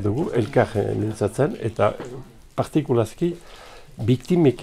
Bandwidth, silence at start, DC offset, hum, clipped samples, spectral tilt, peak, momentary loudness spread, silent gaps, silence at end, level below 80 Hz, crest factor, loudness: 14.5 kHz; 0 s; under 0.1%; none; under 0.1%; -7.5 dB/octave; -6 dBFS; 17 LU; none; 0 s; -48 dBFS; 18 dB; -23 LUFS